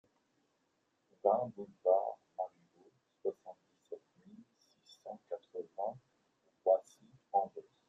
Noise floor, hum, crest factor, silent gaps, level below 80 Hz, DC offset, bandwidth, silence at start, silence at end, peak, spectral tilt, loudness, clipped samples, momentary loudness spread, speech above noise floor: -80 dBFS; none; 24 dB; none; under -90 dBFS; under 0.1%; 7.6 kHz; 1.25 s; 0.25 s; -16 dBFS; -7 dB/octave; -37 LUFS; under 0.1%; 20 LU; 44 dB